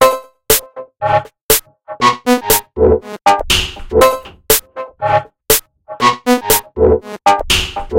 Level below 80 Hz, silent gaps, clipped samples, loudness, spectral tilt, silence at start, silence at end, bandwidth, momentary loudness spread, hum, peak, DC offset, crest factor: -30 dBFS; 1.41-1.49 s; under 0.1%; -13 LUFS; -2.5 dB/octave; 0 s; 0 s; over 20 kHz; 6 LU; none; 0 dBFS; under 0.1%; 14 dB